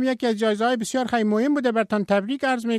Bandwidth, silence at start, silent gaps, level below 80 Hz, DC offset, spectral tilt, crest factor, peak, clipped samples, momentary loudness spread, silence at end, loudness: 13.5 kHz; 0 s; none; -64 dBFS; under 0.1%; -5 dB/octave; 12 dB; -10 dBFS; under 0.1%; 3 LU; 0 s; -22 LUFS